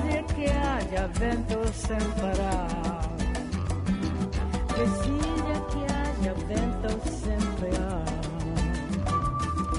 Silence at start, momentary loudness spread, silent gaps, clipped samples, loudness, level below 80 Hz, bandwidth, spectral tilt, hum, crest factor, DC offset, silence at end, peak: 0 s; 4 LU; none; under 0.1%; -29 LUFS; -32 dBFS; 11 kHz; -6 dB/octave; none; 16 dB; under 0.1%; 0 s; -12 dBFS